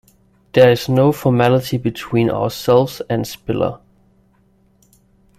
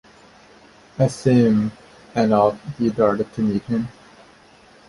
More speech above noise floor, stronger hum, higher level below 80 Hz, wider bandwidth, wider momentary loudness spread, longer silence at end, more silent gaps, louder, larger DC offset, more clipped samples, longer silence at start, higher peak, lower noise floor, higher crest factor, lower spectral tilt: first, 40 dB vs 31 dB; neither; first, -48 dBFS vs -54 dBFS; first, 16 kHz vs 11.5 kHz; about the same, 10 LU vs 11 LU; first, 1.6 s vs 1 s; neither; first, -16 LUFS vs -20 LUFS; neither; neither; second, 0.55 s vs 1 s; about the same, 0 dBFS vs -2 dBFS; first, -56 dBFS vs -50 dBFS; about the same, 16 dB vs 18 dB; about the same, -6.5 dB/octave vs -7.5 dB/octave